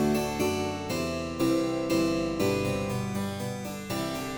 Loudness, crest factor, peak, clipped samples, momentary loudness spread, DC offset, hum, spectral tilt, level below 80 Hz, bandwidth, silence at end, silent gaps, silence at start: -29 LUFS; 14 dB; -14 dBFS; under 0.1%; 7 LU; under 0.1%; none; -5.5 dB/octave; -50 dBFS; over 20 kHz; 0 s; none; 0 s